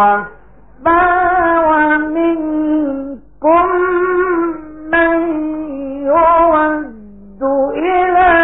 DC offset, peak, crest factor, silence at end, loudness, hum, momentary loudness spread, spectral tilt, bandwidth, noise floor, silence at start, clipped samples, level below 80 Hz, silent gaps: 0.8%; 0 dBFS; 14 dB; 0 s; -13 LUFS; none; 11 LU; -11 dB/octave; 3.9 kHz; -36 dBFS; 0 s; under 0.1%; -40 dBFS; none